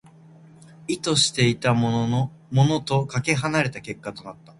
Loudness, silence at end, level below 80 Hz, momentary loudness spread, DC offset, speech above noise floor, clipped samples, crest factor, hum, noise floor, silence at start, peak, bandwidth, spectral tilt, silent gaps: -22 LUFS; 0.25 s; -56 dBFS; 15 LU; under 0.1%; 26 dB; under 0.1%; 20 dB; none; -49 dBFS; 0.8 s; -4 dBFS; 11.5 kHz; -4.5 dB/octave; none